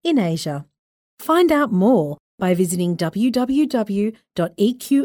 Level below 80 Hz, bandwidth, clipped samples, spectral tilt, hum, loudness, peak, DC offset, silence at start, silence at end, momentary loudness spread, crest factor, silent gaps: -58 dBFS; over 20 kHz; under 0.1%; -6 dB/octave; none; -19 LUFS; -6 dBFS; under 0.1%; 0.05 s; 0 s; 9 LU; 14 dB; 0.79-1.17 s, 2.20-2.38 s